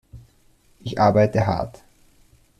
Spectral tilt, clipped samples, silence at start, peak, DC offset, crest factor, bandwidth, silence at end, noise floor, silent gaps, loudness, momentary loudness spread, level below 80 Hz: -7.5 dB/octave; under 0.1%; 0.15 s; -4 dBFS; under 0.1%; 18 dB; 11.5 kHz; 0.9 s; -57 dBFS; none; -20 LUFS; 17 LU; -48 dBFS